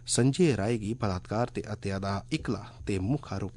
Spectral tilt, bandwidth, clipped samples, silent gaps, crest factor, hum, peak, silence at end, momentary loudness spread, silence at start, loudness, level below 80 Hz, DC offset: -5.5 dB/octave; 11 kHz; under 0.1%; none; 16 dB; none; -14 dBFS; 0 s; 9 LU; 0 s; -30 LUFS; -52 dBFS; under 0.1%